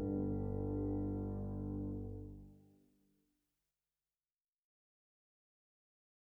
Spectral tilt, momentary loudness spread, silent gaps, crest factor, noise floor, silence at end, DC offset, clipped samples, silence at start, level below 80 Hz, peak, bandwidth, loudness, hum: -12.5 dB/octave; 14 LU; none; 16 dB; under -90 dBFS; 3.75 s; under 0.1%; under 0.1%; 0 s; -54 dBFS; -28 dBFS; 2.1 kHz; -42 LUFS; none